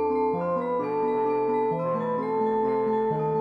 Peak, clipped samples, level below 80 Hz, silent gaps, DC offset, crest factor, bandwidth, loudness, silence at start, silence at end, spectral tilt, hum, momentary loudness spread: -14 dBFS; under 0.1%; -66 dBFS; none; under 0.1%; 10 dB; 4.8 kHz; -26 LUFS; 0 s; 0 s; -9.5 dB/octave; none; 2 LU